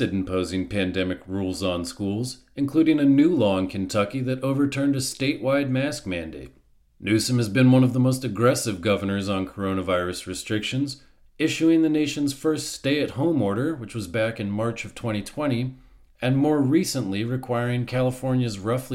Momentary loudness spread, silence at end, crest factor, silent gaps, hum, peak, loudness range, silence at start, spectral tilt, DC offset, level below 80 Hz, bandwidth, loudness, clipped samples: 10 LU; 0 s; 16 dB; none; none; -6 dBFS; 4 LU; 0 s; -6 dB/octave; under 0.1%; -52 dBFS; 16 kHz; -24 LUFS; under 0.1%